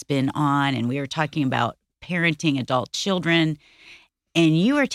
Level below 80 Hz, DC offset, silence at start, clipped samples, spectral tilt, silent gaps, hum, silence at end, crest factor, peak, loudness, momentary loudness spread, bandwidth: -58 dBFS; under 0.1%; 0 s; under 0.1%; -5.5 dB/octave; none; none; 0 s; 16 dB; -6 dBFS; -22 LUFS; 6 LU; 13 kHz